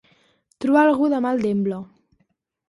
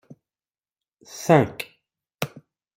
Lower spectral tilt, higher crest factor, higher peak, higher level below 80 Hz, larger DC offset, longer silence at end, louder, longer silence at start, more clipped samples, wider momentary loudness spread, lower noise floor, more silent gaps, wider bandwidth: first, -7.5 dB/octave vs -6 dB/octave; second, 16 dB vs 24 dB; about the same, -6 dBFS vs -4 dBFS; about the same, -64 dBFS vs -64 dBFS; neither; first, 0.85 s vs 0.5 s; first, -20 LUFS vs -23 LUFS; second, 0.6 s vs 1.15 s; neither; second, 11 LU vs 18 LU; second, -69 dBFS vs under -90 dBFS; neither; second, 11.5 kHz vs 16 kHz